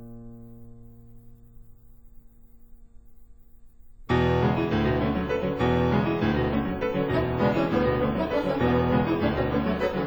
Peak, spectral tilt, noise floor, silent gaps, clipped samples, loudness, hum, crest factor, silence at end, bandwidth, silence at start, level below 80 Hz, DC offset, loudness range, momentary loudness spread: -10 dBFS; -8.5 dB/octave; -49 dBFS; none; under 0.1%; -25 LUFS; none; 16 dB; 0 s; over 20 kHz; 0 s; -40 dBFS; under 0.1%; 5 LU; 4 LU